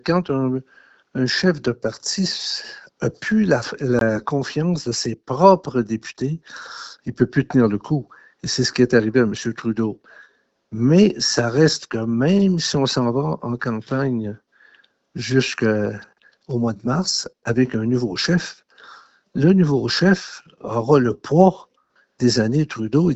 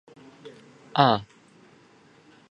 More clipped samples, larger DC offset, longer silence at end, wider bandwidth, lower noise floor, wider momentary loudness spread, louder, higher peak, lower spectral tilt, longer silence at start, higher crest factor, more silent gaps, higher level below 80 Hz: neither; neither; second, 0 s vs 1.25 s; about the same, 8.2 kHz vs 9 kHz; first, -62 dBFS vs -56 dBFS; second, 14 LU vs 27 LU; first, -20 LUFS vs -23 LUFS; about the same, 0 dBFS vs -2 dBFS; second, -5.5 dB/octave vs -7 dB/octave; second, 0.05 s vs 0.45 s; second, 20 dB vs 26 dB; neither; first, -54 dBFS vs -68 dBFS